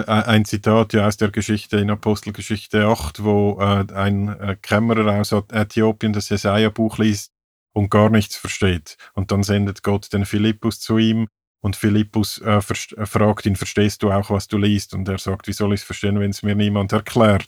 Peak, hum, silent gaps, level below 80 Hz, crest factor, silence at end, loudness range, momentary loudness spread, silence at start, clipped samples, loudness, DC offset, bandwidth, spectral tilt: 0 dBFS; none; 7.44-7.66 s, 11.47-11.55 s; -46 dBFS; 18 dB; 0 s; 1 LU; 8 LU; 0 s; under 0.1%; -19 LUFS; under 0.1%; 15.5 kHz; -6 dB/octave